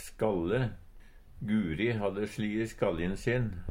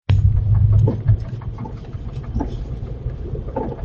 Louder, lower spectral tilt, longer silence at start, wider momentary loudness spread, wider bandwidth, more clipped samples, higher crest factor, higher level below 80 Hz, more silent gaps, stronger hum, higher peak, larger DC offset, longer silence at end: second, -32 LUFS vs -21 LUFS; second, -7 dB/octave vs -10 dB/octave; about the same, 0 s vs 0.1 s; second, 4 LU vs 15 LU; first, 16.5 kHz vs 4.3 kHz; neither; about the same, 18 dB vs 16 dB; second, -48 dBFS vs -26 dBFS; neither; neither; second, -14 dBFS vs -4 dBFS; neither; about the same, 0 s vs 0 s